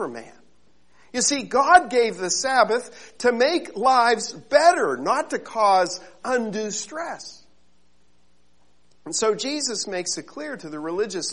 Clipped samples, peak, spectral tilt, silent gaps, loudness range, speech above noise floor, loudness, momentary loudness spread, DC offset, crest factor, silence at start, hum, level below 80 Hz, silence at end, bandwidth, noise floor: under 0.1%; -2 dBFS; -2 dB/octave; none; 9 LU; 43 dB; -22 LUFS; 15 LU; 0.3%; 22 dB; 0 s; none; -62 dBFS; 0 s; 11 kHz; -65 dBFS